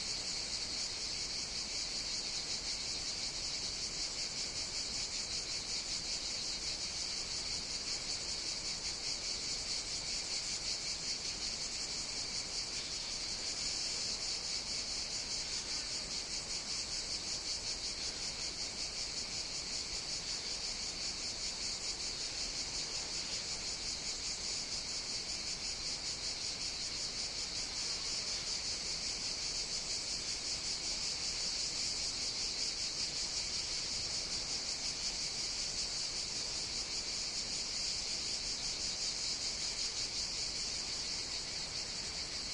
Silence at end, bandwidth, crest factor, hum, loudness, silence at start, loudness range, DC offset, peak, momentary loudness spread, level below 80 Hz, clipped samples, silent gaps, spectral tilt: 0 s; 11.5 kHz; 16 dB; none; -36 LUFS; 0 s; 2 LU; under 0.1%; -24 dBFS; 2 LU; -56 dBFS; under 0.1%; none; 0 dB/octave